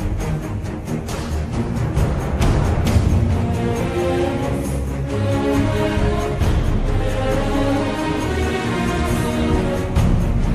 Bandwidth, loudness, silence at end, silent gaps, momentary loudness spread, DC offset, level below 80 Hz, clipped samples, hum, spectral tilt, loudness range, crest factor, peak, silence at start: 14 kHz; -20 LUFS; 0 s; none; 6 LU; under 0.1%; -24 dBFS; under 0.1%; none; -6.5 dB/octave; 1 LU; 14 dB; -4 dBFS; 0 s